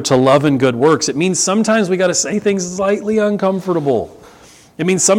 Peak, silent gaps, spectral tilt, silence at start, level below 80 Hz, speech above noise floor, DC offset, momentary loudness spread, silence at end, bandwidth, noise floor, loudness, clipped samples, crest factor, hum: 0 dBFS; none; -4 dB/octave; 0 s; -52 dBFS; 29 dB; under 0.1%; 6 LU; 0 s; 16.5 kHz; -43 dBFS; -15 LUFS; under 0.1%; 14 dB; none